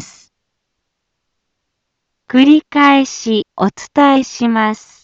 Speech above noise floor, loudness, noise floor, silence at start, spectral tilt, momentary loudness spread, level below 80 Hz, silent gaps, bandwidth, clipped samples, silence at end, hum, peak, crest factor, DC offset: 61 dB; -13 LUFS; -73 dBFS; 0 s; -4.5 dB/octave; 9 LU; -58 dBFS; none; 7.8 kHz; under 0.1%; 0.3 s; none; 0 dBFS; 14 dB; under 0.1%